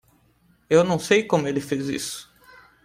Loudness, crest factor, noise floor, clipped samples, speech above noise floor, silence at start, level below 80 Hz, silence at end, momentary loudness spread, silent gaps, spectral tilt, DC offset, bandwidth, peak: -22 LUFS; 20 dB; -61 dBFS; under 0.1%; 39 dB; 0.7 s; -60 dBFS; 0.6 s; 11 LU; none; -5 dB/octave; under 0.1%; 16 kHz; -4 dBFS